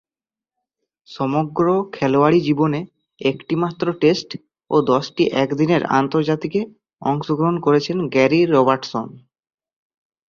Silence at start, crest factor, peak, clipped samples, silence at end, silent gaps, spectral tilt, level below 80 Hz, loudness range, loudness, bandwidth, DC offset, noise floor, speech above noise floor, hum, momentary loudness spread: 1.1 s; 18 dB; -2 dBFS; under 0.1%; 1.1 s; none; -7 dB/octave; -60 dBFS; 2 LU; -19 LUFS; 7.2 kHz; under 0.1%; under -90 dBFS; over 72 dB; none; 11 LU